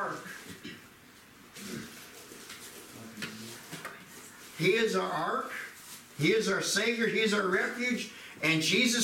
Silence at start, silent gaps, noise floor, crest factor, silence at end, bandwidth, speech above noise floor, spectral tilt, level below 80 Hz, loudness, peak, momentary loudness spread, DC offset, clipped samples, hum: 0 s; none; -55 dBFS; 18 dB; 0 s; 16.5 kHz; 27 dB; -3.5 dB/octave; -72 dBFS; -29 LUFS; -14 dBFS; 20 LU; under 0.1%; under 0.1%; none